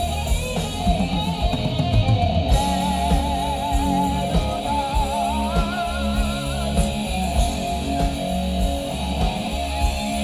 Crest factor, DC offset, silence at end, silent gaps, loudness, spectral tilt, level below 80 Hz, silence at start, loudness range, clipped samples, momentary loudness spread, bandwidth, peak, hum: 16 dB; under 0.1%; 0 s; none; -22 LUFS; -5.5 dB/octave; -26 dBFS; 0 s; 2 LU; under 0.1%; 4 LU; 15.5 kHz; -6 dBFS; none